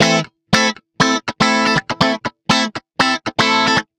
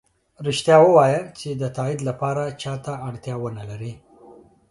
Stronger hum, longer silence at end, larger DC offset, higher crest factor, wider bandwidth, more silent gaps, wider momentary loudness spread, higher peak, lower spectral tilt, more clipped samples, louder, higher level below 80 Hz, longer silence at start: neither; second, 0.15 s vs 0.4 s; neither; about the same, 16 dB vs 20 dB; first, 15.5 kHz vs 11.5 kHz; neither; second, 5 LU vs 17 LU; about the same, 0 dBFS vs -2 dBFS; second, -3.5 dB/octave vs -6 dB/octave; neither; first, -16 LUFS vs -21 LUFS; first, -46 dBFS vs -58 dBFS; second, 0 s vs 0.4 s